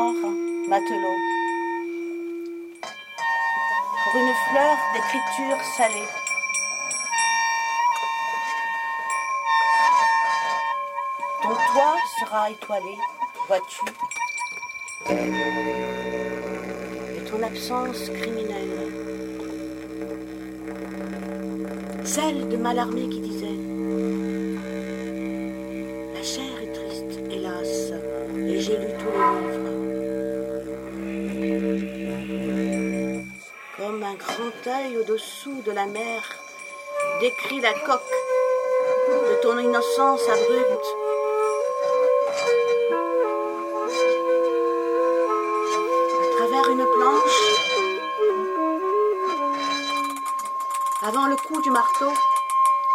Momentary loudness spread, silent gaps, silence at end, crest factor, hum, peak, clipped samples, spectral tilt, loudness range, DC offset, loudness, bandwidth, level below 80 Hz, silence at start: 12 LU; none; 0 s; 20 dB; none; -4 dBFS; under 0.1%; -3.5 dB/octave; 9 LU; under 0.1%; -24 LUFS; 16.5 kHz; -56 dBFS; 0 s